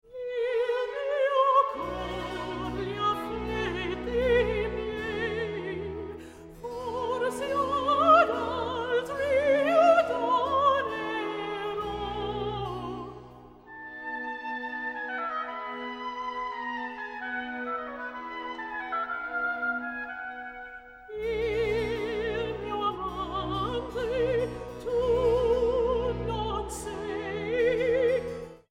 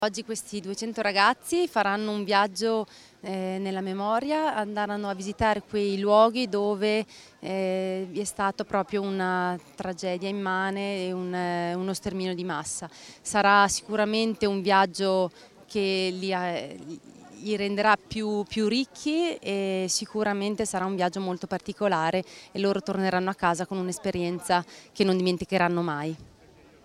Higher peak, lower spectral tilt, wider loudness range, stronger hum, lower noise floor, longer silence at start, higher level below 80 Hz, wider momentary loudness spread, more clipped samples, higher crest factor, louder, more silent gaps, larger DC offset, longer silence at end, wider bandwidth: about the same, -8 dBFS vs -6 dBFS; about the same, -5.5 dB/octave vs -4.5 dB/octave; first, 10 LU vs 4 LU; neither; second, -49 dBFS vs -54 dBFS; about the same, 0.1 s vs 0 s; first, -48 dBFS vs -60 dBFS; about the same, 13 LU vs 11 LU; neither; about the same, 20 dB vs 20 dB; about the same, -29 LUFS vs -27 LUFS; neither; neither; second, 0.15 s vs 0.55 s; about the same, 15 kHz vs 14.5 kHz